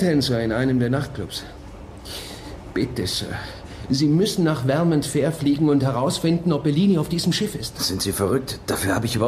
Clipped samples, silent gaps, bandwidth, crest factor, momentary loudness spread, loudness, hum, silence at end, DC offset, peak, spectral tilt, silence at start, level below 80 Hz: under 0.1%; none; 15.5 kHz; 16 dB; 15 LU; -22 LUFS; none; 0 s; under 0.1%; -6 dBFS; -5.5 dB/octave; 0 s; -44 dBFS